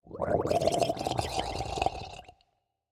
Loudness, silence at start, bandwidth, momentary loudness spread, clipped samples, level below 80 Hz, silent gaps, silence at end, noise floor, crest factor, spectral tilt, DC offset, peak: -30 LUFS; 0.05 s; 16.5 kHz; 14 LU; under 0.1%; -48 dBFS; none; 0.6 s; -75 dBFS; 20 dB; -4.5 dB/octave; under 0.1%; -10 dBFS